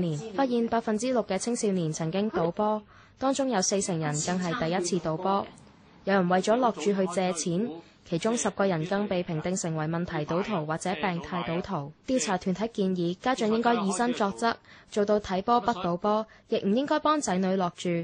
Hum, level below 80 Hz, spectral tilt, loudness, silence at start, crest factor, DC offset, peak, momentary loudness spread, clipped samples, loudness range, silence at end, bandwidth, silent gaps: none; -60 dBFS; -5 dB/octave; -28 LUFS; 0 s; 16 dB; under 0.1%; -12 dBFS; 6 LU; under 0.1%; 3 LU; 0 s; 10 kHz; none